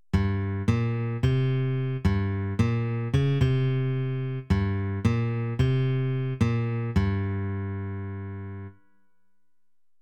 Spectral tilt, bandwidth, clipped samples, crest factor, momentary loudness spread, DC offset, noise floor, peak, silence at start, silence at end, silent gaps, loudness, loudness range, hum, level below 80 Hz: -8.5 dB/octave; 8.4 kHz; under 0.1%; 16 dB; 10 LU; under 0.1%; -89 dBFS; -10 dBFS; 0.15 s; 1.25 s; none; -27 LUFS; 4 LU; none; -42 dBFS